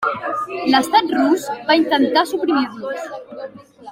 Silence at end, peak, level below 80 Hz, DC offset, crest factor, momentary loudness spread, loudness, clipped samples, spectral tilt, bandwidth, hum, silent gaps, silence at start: 0 s; -2 dBFS; -62 dBFS; under 0.1%; 16 dB; 17 LU; -18 LUFS; under 0.1%; -3.5 dB/octave; 16 kHz; none; none; 0 s